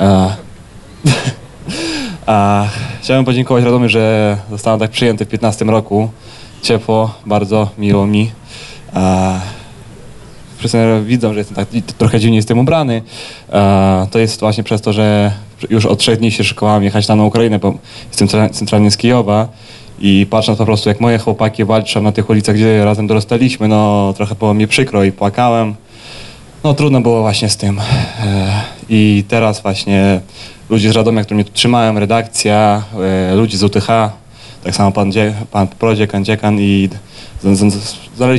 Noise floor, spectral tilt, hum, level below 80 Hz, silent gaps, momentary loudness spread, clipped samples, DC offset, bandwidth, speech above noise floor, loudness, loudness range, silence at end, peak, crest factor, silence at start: -35 dBFS; -6 dB/octave; none; -36 dBFS; none; 9 LU; under 0.1%; 0.1%; 12 kHz; 23 dB; -12 LUFS; 3 LU; 0 s; 0 dBFS; 12 dB; 0 s